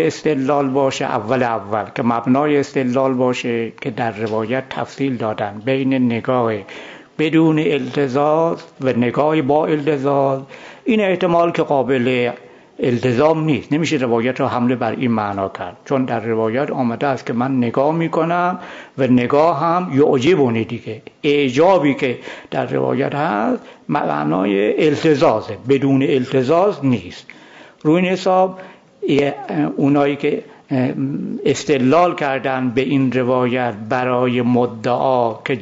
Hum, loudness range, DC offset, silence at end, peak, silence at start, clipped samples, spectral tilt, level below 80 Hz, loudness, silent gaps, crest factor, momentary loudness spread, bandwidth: none; 3 LU; under 0.1%; 0 s; -4 dBFS; 0 s; under 0.1%; -7 dB/octave; -58 dBFS; -17 LUFS; none; 14 dB; 8 LU; 7.8 kHz